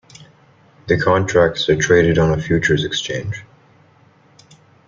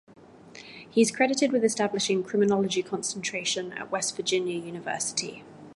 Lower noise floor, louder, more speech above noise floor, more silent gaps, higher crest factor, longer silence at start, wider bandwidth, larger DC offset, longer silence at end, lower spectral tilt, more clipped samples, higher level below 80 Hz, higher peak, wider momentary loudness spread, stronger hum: first, -52 dBFS vs -48 dBFS; first, -16 LUFS vs -27 LUFS; first, 36 dB vs 22 dB; neither; about the same, 16 dB vs 18 dB; second, 0.2 s vs 0.45 s; second, 7.6 kHz vs 11.5 kHz; neither; first, 1.45 s vs 0 s; first, -5 dB/octave vs -3 dB/octave; neither; first, -42 dBFS vs -72 dBFS; first, -2 dBFS vs -8 dBFS; about the same, 13 LU vs 11 LU; neither